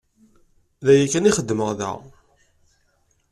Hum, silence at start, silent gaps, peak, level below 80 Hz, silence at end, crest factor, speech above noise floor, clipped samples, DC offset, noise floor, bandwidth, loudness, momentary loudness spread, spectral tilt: none; 0.8 s; none; -4 dBFS; -54 dBFS; 1.3 s; 18 dB; 46 dB; under 0.1%; under 0.1%; -65 dBFS; 12.5 kHz; -20 LUFS; 13 LU; -5 dB/octave